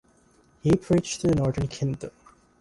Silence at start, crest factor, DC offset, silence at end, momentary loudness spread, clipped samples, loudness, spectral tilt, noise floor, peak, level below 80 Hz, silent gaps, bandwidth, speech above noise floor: 0.65 s; 16 dB; under 0.1%; 0.5 s; 10 LU; under 0.1%; -25 LUFS; -6.5 dB/octave; -60 dBFS; -10 dBFS; -46 dBFS; none; 11.5 kHz; 36 dB